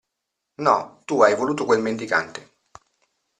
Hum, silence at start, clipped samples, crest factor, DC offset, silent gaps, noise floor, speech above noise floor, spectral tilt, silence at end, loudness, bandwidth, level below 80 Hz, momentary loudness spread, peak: none; 0.6 s; under 0.1%; 20 dB; under 0.1%; none; -81 dBFS; 60 dB; -4.5 dB/octave; 1 s; -21 LUFS; 10 kHz; -66 dBFS; 9 LU; -2 dBFS